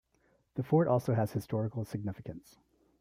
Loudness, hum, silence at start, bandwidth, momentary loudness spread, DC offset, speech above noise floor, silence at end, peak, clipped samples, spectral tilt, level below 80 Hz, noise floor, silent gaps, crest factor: -32 LUFS; none; 0.55 s; 15.5 kHz; 17 LU; under 0.1%; 40 dB; 0.6 s; -14 dBFS; under 0.1%; -8.5 dB/octave; -66 dBFS; -72 dBFS; none; 18 dB